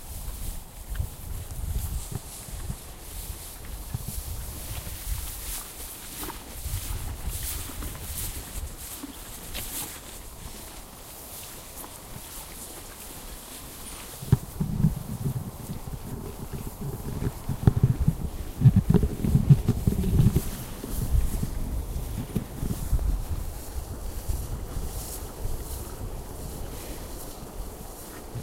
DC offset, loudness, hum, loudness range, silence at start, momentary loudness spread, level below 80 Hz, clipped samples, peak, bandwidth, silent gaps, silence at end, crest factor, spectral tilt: under 0.1%; -31 LUFS; none; 13 LU; 0 s; 16 LU; -34 dBFS; under 0.1%; -4 dBFS; 16 kHz; none; 0 s; 24 dB; -6 dB/octave